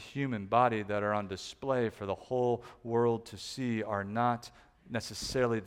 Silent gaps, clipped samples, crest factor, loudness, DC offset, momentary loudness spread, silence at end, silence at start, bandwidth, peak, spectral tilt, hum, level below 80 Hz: none; under 0.1%; 20 dB; -33 LUFS; under 0.1%; 10 LU; 0 s; 0 s; 16 kHz; -12 dBFS; -5.5 dB/octave; none; -60 dBFS